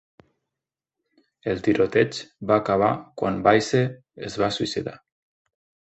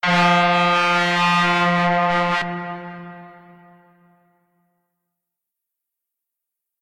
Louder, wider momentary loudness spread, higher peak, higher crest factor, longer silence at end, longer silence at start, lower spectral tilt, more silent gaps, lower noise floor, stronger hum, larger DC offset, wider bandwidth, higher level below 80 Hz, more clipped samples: second, -23 LUFS vs -17 LUFS; second, 14 LU vs 18 LU; about the same, -4 dBFS vs -4 dBFS; first, 22 dB vs 16 dB; second, 0.95 s vs 3.5 s; first, 1.45 s vs 0.05 s; about the same, -5.5 dB/octave vs -5 dB/octave; neither; first, -88 dBFS vs -83 dBFS; neither; neither; second, 8.4 kHz vs 11.5 kHz; about the same, -56 dBFS vs -60 dBFS; neither